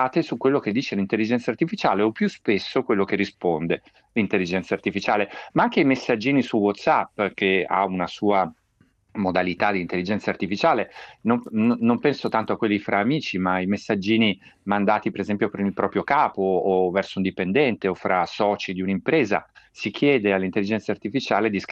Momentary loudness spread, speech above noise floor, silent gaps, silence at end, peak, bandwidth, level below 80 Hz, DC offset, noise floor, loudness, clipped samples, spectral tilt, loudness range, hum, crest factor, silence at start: 6 LU; 40 dB; none; 0 s; -4 dBFS; 8 kHz; -64 dBFS; under 0.1%; -63 dBFS; -23 LUFS; under 0.1%; -6.5 dB/octave; 2 LU; none; 18 dB; 0 s